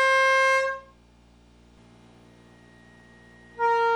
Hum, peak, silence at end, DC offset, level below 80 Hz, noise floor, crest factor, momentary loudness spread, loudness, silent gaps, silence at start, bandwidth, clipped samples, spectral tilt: none; -14 dBFS; 0 s; under 0.1%; -60 dBFS; -56 dBFS; 14 dB; 18 LU; -22 LUFS; none; 0 s; 13 kHz; under 0.1%; -1 dB/octave